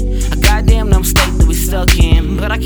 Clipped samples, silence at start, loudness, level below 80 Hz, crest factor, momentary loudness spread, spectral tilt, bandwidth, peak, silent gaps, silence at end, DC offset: under 0.1%; 0 s; -13 LUFS; -12 dBFS; 10 dB; 3 LU; -4.5 dB/octave; over 20 kHz; 0 dBFS; none; 0 s; under 0.1%